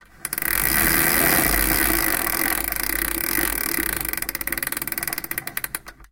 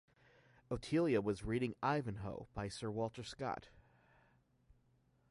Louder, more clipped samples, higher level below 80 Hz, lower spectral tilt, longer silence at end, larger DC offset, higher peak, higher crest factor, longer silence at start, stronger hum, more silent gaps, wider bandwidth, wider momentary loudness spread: first, -20 LUFS vs -40 LUFS; neither; first, -36 dBFS vs -62 dBFS; second, -2 dB/octave vs -6.5 dB/octave; second, 0.05 s vs 1.5 s; neither; first, -2 dBFS vs -22 dBFS; about the same, 22 dB vs 20 dB; second, 0.2 s vs 0.7 s; neither; neither; first, 18 kHz vs 11.5 kHz; about the same, 10 LU vs 11 LU